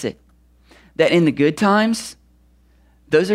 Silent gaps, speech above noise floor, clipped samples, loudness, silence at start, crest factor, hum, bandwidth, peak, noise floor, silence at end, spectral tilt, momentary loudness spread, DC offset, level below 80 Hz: none; 38 dB; under 0.1%; -17 LUFS; 0 s; 16 dB; 60 Hz at -50 dBFS; 15 kHz; -2 dBFS; -54 dBFS; 0 s; -5.5 dB/octave; 15 LU; under 0.1%; -54 dBFS